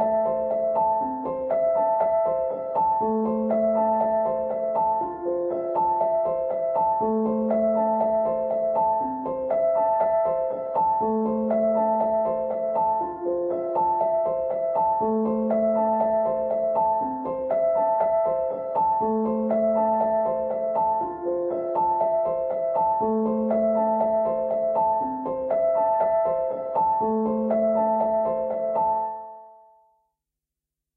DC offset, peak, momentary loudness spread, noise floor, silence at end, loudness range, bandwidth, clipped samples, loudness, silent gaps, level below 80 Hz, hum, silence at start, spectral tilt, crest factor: under 0.1%; -12 dBFS; 5 LU; -87 dBFS; 1.45 s; 1 LU; 2.8 kHz; under 0.1%; -24 LUFS; none; -58 dBFS; none; 0 s; -11.5 dB/octave; 12 dB